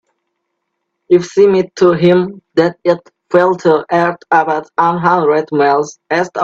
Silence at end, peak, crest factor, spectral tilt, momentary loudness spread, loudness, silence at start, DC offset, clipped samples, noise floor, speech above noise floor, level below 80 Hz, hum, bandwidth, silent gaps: 0 s; 0 dBFS; 12 dB; -6.5 dB/octave; 6 LU; -13 LUFS; 1.1 s; under 0.1%; under 0.1%; -72 dBFS; 60 dB; -56 dBFS; none; 7.8 kHz; none